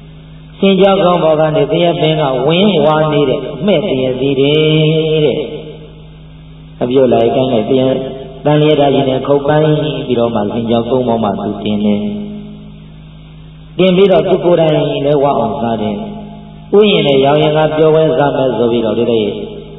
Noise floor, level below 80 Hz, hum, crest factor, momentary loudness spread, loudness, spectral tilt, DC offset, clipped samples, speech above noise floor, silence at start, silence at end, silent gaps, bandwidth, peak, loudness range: -33 dBFS; -40 dBFS; none; 12 dB; 11 LU; -12 LUFS; -10 dB/octave; under 0.1%; under 0.1%; 23 dB; 0 s; 0 s; none; 4 kHz; 0 dBFS; 4 LU